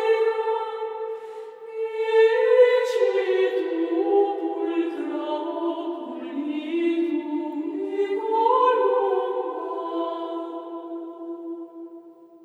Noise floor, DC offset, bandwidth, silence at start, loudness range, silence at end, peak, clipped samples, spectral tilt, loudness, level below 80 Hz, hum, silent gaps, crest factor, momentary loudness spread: -46 dBFS; under 0.1%; 9.2 kHz; 0 s; 6 LU; 0.1 s; -6 dBFS; under 0.1%; -3.5 dB/octave; -24 LUFS; under -90 dBFS; none; none; 18 dB; 17 LU